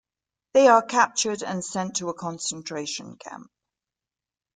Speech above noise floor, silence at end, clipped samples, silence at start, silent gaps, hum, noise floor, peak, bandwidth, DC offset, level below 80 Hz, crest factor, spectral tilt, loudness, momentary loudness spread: over 66 dB; 1.15 s; under 0.1%; 0.55 s; none; none; under -90 dBFS; -4 dBFS; 9.6 kHz; under 0.1%; -72 dBFS; 22 dB; -3 dB/octave; -23 LUFS; 22 LU